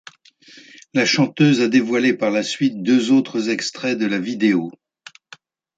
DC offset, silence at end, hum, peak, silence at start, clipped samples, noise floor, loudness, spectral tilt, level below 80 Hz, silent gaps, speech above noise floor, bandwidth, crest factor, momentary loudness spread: under 0.1%; 1.05 s; none; -4 dBFS; 0.95 s; under 0.1%; -48 dBFS; -18 LUFS; -5 dB/octave; -68 dBFS; none; 30 dB; 9 kHz; 16 dB; 7 LU